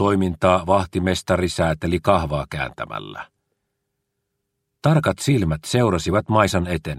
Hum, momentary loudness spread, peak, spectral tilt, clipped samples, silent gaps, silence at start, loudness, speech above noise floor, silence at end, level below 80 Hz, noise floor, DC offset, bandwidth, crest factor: none; 9 LU; 0 dBFS; -6 dB/octave; under 0.1%; none; 0 s; -20 LUFS; 57 dB; 0 s; -40 dBFS; -77 dBFS; under 0.1%; 15 kHz; 20 dB